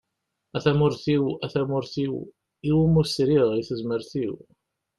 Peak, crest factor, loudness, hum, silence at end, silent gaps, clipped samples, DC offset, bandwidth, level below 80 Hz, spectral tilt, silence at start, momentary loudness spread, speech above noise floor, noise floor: -8 dBFS; 16 dB; -24 LUFS; none; 0.6 s; none; under 0.1%; under 0.1%; 12 kHz; -52 dBFS; -7.5 dB/octave; 0.55 s; 12 LU; 56 dB; -80 dBFS